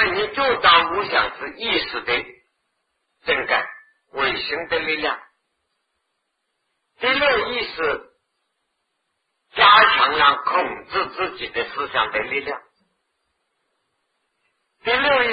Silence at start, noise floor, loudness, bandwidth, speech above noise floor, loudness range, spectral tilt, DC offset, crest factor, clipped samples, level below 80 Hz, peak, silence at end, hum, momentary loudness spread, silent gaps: 0 s; -75 dBFS; -19 LUFS; 5 kHz; 55 dB; 9 LU; -6 dB/octave; under 0.1%; 22 dB; under 0.1%; -54 dBFS; 0 dBFS; 0 s; none; 14 LU; none